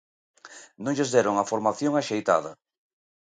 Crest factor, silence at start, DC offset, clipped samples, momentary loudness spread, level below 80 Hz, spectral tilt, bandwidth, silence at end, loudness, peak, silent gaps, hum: 20 dB; 0.45 s; under 0.1%; under 0.1%; 18 LU; -70 dBFS; -4.5 dB/octave; 9.4 kHz; 0.7 s; -25 LUFS; -6 dBFS; none; none